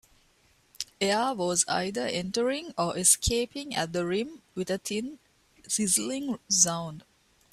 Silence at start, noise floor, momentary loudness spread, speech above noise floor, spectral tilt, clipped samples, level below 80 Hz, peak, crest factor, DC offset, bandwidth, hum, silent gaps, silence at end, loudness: 0.8 s; -65 dBFS; 13 LU; 36 dB; -2.5 dB/octave; under 0.1%; -50 dBFS; -6 dBFS; 22 dB; under 0.1%; 15.5 kHz; none; none; 0.55 s; -27 LUFS